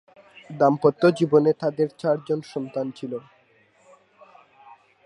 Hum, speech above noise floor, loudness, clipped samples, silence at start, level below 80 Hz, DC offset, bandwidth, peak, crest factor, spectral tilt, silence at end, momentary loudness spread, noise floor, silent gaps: none; 38 dB; -23 LUFS; under 0.1%; 0.5 s; -70 dBFS; under 0.1%; 11 kHz; -4 dBFS; 20 dB; -7.5 dB/octave; 1.85 s; 15 LU; -60 dBFS; none